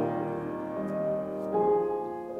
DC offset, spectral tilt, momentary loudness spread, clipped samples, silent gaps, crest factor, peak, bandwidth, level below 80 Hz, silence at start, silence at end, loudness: under 0.1%; -9.5 dB/octave; 8 LU; under 0.1%; none; 14 dB; -16 dBFS; 4.5 kHz; -64 dBFS; 0 s; 0 s; -30 LUFS